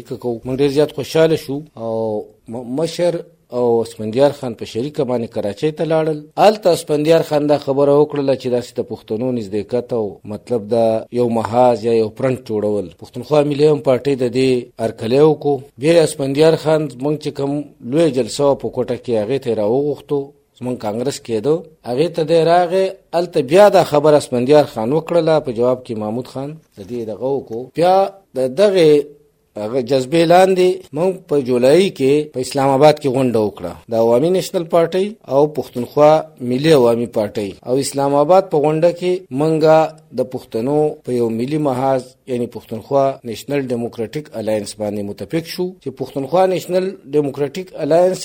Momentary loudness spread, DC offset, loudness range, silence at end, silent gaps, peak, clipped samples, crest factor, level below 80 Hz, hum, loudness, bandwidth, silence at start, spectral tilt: 12 LU; under 0.1%; 6 LU; 0 s; none; 0 dBFS; under 0.1%; 16 dB; -56 dBFS; none; -17 LUFS; 16.5 kHz; 0.1 s; -6 dB/octave